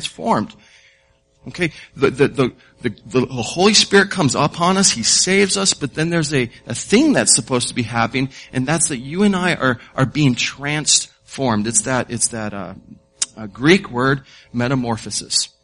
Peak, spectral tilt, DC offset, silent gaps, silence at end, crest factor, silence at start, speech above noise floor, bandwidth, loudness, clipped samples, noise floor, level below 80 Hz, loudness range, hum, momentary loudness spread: 0 dBFS; -3.5 dB/octave; under 0.1%; none; 0.15 s; 18 dB; 0 s; 40 dB; 11 kHz; -17 LUFS; under 0.1%; -58 dBFS; -50 dBFS; 5 LU; none; 11 LU